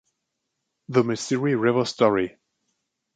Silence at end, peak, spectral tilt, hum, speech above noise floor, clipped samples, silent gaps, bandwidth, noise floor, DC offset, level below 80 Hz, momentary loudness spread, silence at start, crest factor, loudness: 0.85 s; -6 dBFS; -5.5 dB/octave; none; 58 dB; under 0.1%; none; 9.4 kHz; -79 dBFS; under 0.1%; -62 dBFS; 4 LU; 0.9 s; 20 dB; -23 LUFS